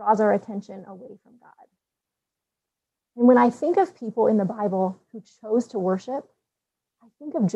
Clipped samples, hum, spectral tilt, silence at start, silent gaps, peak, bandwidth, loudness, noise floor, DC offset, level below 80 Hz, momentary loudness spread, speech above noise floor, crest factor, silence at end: under 0.1%; none; -8 dB/octave; 0 s; none; -6 dBFS; 8.4 kHz; -22 LUFS; -86 dBFS; under 0.1%; -76 dBFS; 23 LU; 63 dB; 20 dB; 0.05 s